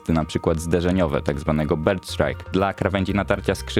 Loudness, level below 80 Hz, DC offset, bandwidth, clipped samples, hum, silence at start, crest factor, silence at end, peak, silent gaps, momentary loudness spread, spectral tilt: -22 LUFS; -36 dBFS; under 0.1%; 16 kHz; under 0.1%; none; 0.05 s; 18 dB; 0 s; -2 dBFS; none; 2 LU; -6.5 dB/octave